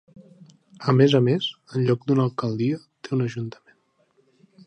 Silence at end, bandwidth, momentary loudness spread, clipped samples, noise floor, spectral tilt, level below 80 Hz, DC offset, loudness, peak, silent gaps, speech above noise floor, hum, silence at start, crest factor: 1.15 s; 8.4 kHz; 12 LU; under 0.1%; -65 dBFS; -7.5 dB/octave; -68 dBFS; under 0.1%; -23 LUFS; -4 dBFS; none; 43 dB; none; 0.8 s; 20 dB